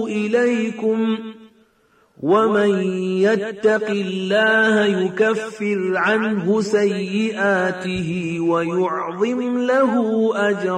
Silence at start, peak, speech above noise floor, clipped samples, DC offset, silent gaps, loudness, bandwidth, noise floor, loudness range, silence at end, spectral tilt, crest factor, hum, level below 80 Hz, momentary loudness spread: 0 s; -6 dBFS; 40 dB; under 0.1%; under 0.1%; none; -19 LUFS; 10 kHz; -58 dBFS; 2 LU; 0 s; -6 dB/octave; 14 dB; none; -60 dBFS; 7 LU